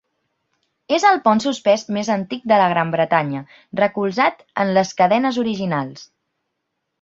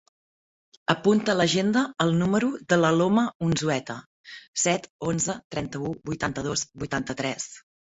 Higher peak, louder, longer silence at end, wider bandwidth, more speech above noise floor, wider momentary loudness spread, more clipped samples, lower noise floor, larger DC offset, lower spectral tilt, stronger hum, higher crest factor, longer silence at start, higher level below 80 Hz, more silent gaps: about the same, -2 dBFS vs -2 dBFS; first, -18 LUFS vs -25 LUFS; first, 0.95 s vs 0.35 s; about the same, 7.8 kHz vs 8.2 kHz; second, 58 dB vs over 65 dB; second, 8 LU vs 11 LU; neither; second, -76 dBFS vs under -90 dBFS; neither; about the same, -5.5 dB/octave vs -4.5 dB/octave; neither; about the same, 18 dB vs 22 dB; about the same, 0.9 s vs 0.9 s; second, -64 dBFS vs -56 dBFS; second, none vs 3.35-3.40 s, 4.06-4.24 s, 4.48-4.53 s, 4.90-4.99 s, 5.44-5.50 s